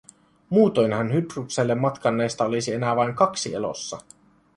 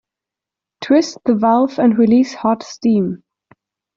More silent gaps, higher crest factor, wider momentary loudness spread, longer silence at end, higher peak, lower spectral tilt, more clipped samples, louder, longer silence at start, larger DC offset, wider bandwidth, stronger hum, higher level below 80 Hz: neither; about the same, 18 dB vs 14 dB; about the same, 9 LU vs 8 LU; second, 0.55 s vs 0.8 s; about the same, -4 dBFS vs -2 dBFS; about the same, -5.5 dB/octave vs -6.5 dB/octave; neither; second, -23 LUFS vs -15 LUFS; second, 0.5 s vs 0.8 s; neither; first, 11.5 kHz vs 7.4 kHz; neither; about the same, -62 dBFS vs -58 dBFS